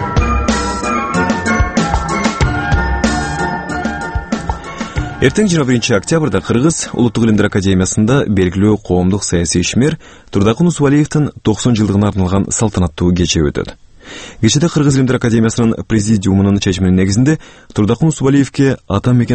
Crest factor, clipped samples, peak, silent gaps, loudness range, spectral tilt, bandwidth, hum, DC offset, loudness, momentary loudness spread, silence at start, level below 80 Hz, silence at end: 14 dB; under 0.1%; 0 dBFS; none; 3 LU; -5.5 dB/octave; 8.8 kHz; none; under 0.1%; -14 LUFS; 8 LU; 0 s; -26 dBFS; 0 s